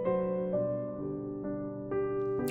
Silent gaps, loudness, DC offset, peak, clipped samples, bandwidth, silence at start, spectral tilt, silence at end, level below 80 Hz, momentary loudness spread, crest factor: none; -34 LUFS; under 0.1%; -18 dBFS; under 0.1%; 3.4 kHz; 0 s; -8.5 dB/octave; 0 s; -60 dBFS; 6 LU; 14 dB